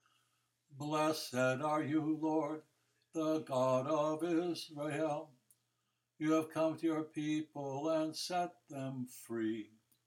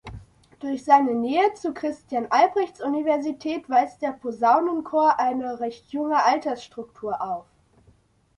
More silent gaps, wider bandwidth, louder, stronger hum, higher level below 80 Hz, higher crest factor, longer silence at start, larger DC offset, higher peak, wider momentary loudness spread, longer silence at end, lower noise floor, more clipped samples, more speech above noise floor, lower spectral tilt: neither; first, 17 kHz vs 11 kHz; second, -37 LUFS vs -23 LUFS; neither; second, -86 dBFS vs -60 dBFS; about the same, 16 dB vs 20 dB; first, 0.7 s vs 0.05 s; neither; second, -22 dBFS vs -4 dBFS; about the same, 10 LU vs 12 LU; second, 0.4 s vs 0.95 s; first, -84 dBFS vs -59 dBFS; neither; first, 48 dB vs 37 dB; about the same, -5.5 dB/octave vs -5 dB/octave